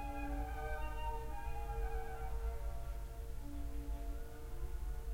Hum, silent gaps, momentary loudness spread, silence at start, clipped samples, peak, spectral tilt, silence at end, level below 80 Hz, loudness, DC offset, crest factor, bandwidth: none; none; 5 LU; 0 s; under 0.1%; -28 dBFS; -6 dB/octave; 0 s; -42 dBFS; -46 LUFS; under 0.1%; 12 dB; 16 kHz